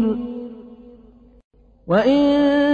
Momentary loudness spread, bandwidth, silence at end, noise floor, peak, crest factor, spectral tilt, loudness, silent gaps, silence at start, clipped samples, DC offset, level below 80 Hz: 20 LU; 6.8 kHz; 0 s; -48 dBFS; -4 dBFS; 16 dB; -7.5 dB/octave; -18 LUFS; 1.44-1.51 s; 0 s; under 0.1%; under 0.1%; -50 dBFS